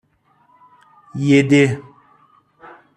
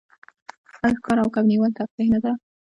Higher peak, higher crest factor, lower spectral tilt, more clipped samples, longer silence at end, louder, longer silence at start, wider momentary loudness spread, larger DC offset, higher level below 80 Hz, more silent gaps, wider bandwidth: first, -2 dBFS vs -6 dBFS; about the same, 18 dB vs 16 dB; about the same, -6.5 dB/octave vs -7.5 dB/octave; neither; first, 1.15 s vs 0.25 s; first, -15 LUFS vs -22 LUFS; first, 1.15 s vs 0.75 s; first, 18 LU vs 5 LU; neither; second, -60 dBFS vs -54 dBFS; second, none vs 1.91-1.98 s; first, 10 kHz vs 7.8 kHz